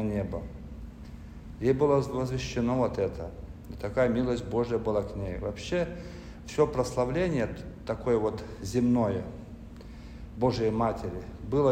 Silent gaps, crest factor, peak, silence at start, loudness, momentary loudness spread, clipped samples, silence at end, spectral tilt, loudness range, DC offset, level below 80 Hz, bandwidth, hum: none; 18 dB; -10 dBFS; 0 s; -29 LUFS; 18 LU; under 0.1%; 0 s; -7 dB/octave; 2 LU; under 0.1%; -46 dBFS; 15 kHz; none